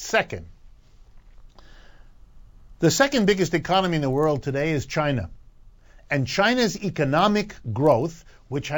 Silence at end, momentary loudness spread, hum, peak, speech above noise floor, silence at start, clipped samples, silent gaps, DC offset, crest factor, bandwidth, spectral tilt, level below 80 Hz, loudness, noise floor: 0 s; 11 LU; none; -6 dBFS; 27 dB; 0 s; under 0.1%; none; under 0.1%; 18 dB; 19 kHz; -5 dB/octave; -46 dBFS; -23 LUFS; -49 dBFS